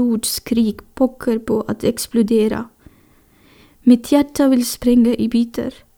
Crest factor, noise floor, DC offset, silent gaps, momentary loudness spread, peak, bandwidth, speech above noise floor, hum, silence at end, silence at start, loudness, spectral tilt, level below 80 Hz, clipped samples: 16 dB; -52 dBFS; under 0.1%; none; 7 LU; 0 dBFS; 19.5 kHz; 36 dB; none; 0.25 s; 0 s; -17 LUFS; -5 dB/octave; -46 dBFS; under 0.1%